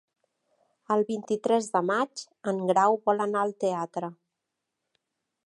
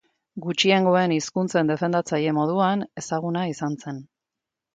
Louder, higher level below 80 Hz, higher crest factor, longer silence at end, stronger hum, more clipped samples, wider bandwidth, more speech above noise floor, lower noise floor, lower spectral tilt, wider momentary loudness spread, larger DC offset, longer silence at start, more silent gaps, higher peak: second, -27 LUFS vs -23 LUFS; second, -80 dBFS vs -68 dBFS; about the same, 18 dB vs 20 dB; first, 1.3 s vs 0.7 s; neither; neither; first, 11.5 kHz vs 9.2 kHz; second, 58 dB vs 64 dB; about the same, -84 dBFS vs -86 dBFS; about the same, -5.5 dB/octave vs -5 dB/octave; second, 11 LU vs 15 LU; neither; first, 0.9 s vs 0.35 s; neither; second, -10 dBFS vs -4 dBFS